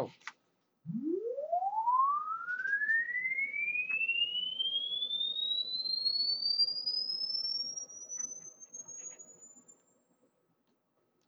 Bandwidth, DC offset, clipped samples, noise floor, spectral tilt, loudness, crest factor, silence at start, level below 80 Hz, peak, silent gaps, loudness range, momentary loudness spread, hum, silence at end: over 20 kHz; under 0.1%; under 0.1%; -77 dBFS; -1 dB/octave; -32 LUFS; 16 dB; 0 s; under -90 dBFS; -20 dBFS; none; 10 LU; 16 LU; none; 1.65 s